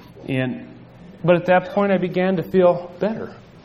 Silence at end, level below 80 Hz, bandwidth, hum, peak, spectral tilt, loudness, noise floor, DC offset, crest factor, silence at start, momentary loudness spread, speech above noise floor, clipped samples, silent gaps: 0.25 s; -56 dBFS; 13.5 kHz; none; -2 dBFS; -9 dB/octave; -20 LUFS; -42 dBFS; under 0.1%; 18 dB; 0.1 s; 11 LU; 23 dB; under 0.1%; none